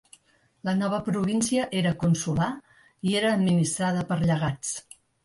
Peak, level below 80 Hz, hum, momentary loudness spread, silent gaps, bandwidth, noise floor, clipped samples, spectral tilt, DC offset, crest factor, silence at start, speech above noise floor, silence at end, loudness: -12 dBFS; -54 dBFS; none; 9 LU; none; 11.5 kHz; -64 dBFS; under 0.1%; -5.5 dB/octave; under 0.1%; 14 dB; 0.65 s; 39 dB; 0.45 s; -26 LUFS